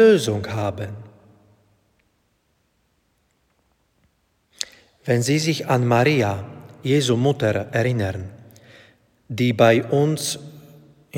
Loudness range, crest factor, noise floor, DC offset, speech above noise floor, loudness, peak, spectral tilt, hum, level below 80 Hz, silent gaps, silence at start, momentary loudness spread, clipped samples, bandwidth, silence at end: 15 LU; 22 dB; -67 dBFS; under 0.1%; 48 dB; -21 LUFS; 0 dBFS; -5.5 dB/octave; none; -60 dBFS; none; 0 s; 17 LU; under 0.1%; 17 kHz; 0 s